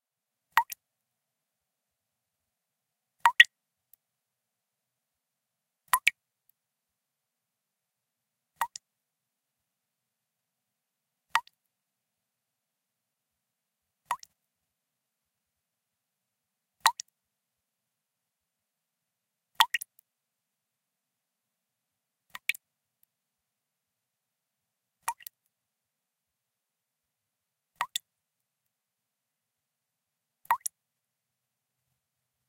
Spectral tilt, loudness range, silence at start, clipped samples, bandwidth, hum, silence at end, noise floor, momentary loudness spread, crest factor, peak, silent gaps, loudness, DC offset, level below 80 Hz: 3.5 dB/octave; 18 LU; 0.55 s; under 0.1%; 16 kHz; none; 1.9 s; -87 dBFS; 23 LU; 38 dB; 0 dBFS; none; -28 LUFS; under 0.1%; under -90 dBFS